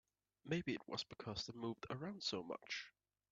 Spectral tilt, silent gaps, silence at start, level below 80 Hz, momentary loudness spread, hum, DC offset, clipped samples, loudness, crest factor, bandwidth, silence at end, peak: -4.5 dB/octave; none; 0.45 s; -76 dBFS; 5 LU; none; under 0.1%; under 0.1%; -46 LUFS; 18 dB; 7.8 kHz; 0.4 s; -30 dBFS